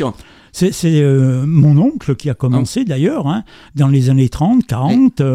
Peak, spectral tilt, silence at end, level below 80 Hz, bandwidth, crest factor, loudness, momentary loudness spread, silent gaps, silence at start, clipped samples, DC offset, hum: 0 dBFS; -7.5 dB/octave; 0 s; -40 dBFS; 13.5 kHz; 12 dB; -14 LUFS; 8 LU; none; 0 s; under 0.1%; under 0.1%; none